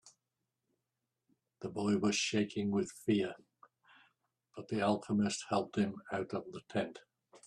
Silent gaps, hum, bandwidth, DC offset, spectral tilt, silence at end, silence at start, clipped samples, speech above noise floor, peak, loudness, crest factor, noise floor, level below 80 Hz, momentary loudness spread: none; none; 12.5 kHz; under 0.1%; -5 dB/octave; 0.1 s; 0.05 s; under 0.1%; 53 dB; -20 dBFS; -36 LUFS; 18 dB; -88 dBFS; -74 dBFS; 12 LU